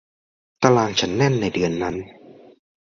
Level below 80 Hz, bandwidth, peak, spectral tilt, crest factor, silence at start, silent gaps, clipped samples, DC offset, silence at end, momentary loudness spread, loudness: -50 dBFS; 7.6 kHz; -2 dBFS; -5 dB/octave; 22 dB; 0.6 s; none; under 0.1%; under 0.1%; 0.55 s; 12 LU; -20 LUFS